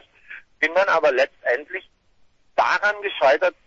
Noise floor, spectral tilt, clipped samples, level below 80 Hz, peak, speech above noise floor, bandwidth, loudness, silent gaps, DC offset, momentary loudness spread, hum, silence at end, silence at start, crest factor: -58 dBFS; -2.5 dB/octave; under 0.1%; -64 dBFS; -6 dBFS; 37 dB; 7.6 kHz; -20 LUFS; none; under 0.1%; 17 LU; none; 0.15 s; 0.3 s; 16 dB